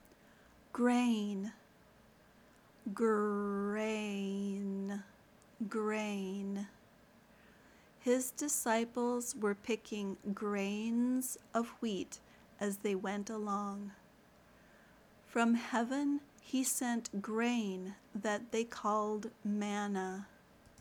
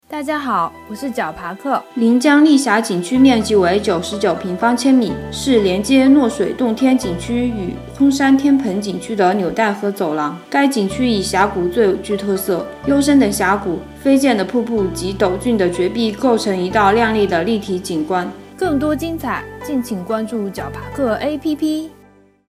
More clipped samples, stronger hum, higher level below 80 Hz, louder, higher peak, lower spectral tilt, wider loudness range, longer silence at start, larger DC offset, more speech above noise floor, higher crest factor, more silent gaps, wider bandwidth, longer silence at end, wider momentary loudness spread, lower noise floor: neither; neither; second, -76 dBFS vs -42 dBFS; second, -37 LUFS vs -16 LUFS; second, -20 dBFS vs 0 dBFS; about the same, -4.5 dB/octave vs -5 dB/octave; about the same, 5 LU vs 6 LU; first, 0.75 s vs 0.1 s; neither; second, 28 dB vs 33 dB; about the same, 18 dB vs 16 dB; neither; first, over 20 kHz vs 15.5 kHz; about the same, 0.55 s vs 0.6 s; about the same, 10 LU vs 10 LU; first, -64 dBFS vs -48 dBFS